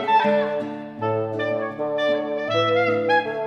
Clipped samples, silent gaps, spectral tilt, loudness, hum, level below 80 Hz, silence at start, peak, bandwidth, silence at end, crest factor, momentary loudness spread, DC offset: under 0.1%; none; -6 dB/octave; -22 LUFS; none; -66 dBFS; 0 s; -8 dBFS; 7 kHz; 0 s; 14 dB; 7 LU; under 0.1%